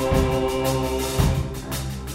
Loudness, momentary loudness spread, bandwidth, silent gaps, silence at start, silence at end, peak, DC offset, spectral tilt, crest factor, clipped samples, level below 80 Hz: -23 LUFS; 8 LU; 16.5 kHz; none; 0 s; 0 s; -6 dBFS; under 0.1%; -5.5 dB/octave; 18 dB; under 0.1%; -30 dBFS